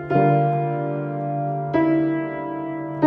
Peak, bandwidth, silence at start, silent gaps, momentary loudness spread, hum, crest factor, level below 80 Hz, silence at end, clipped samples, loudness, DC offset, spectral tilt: -6 dBFS; 5 kHz; 0 s; none; 10 LU; none; 16 dB; -60 dBFS; 0 s; under 0.1%; -22 LUFS; under 0.1%; -11 dB/octave